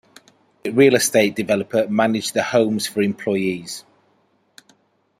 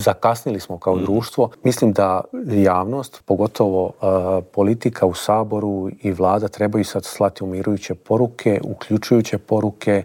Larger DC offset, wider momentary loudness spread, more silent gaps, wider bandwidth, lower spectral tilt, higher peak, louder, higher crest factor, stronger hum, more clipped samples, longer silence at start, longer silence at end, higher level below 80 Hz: neither; first, 13 LU vs 7 LU; neither; about the same, 16 kHz vs 17.5 kHz; second, -4 dB/octave vs -6.5 dB/octave; about the same, -2 dBFS vs -2 dBFS; about the same, -19 LUFS vs -20 LUFS; about the same, 18 dB vs 16 dB; neither; neither; first, 0.65 s vs 0 s; first, 1.4 s vs 0 s; second, -64 dBFS vs -54 dBFS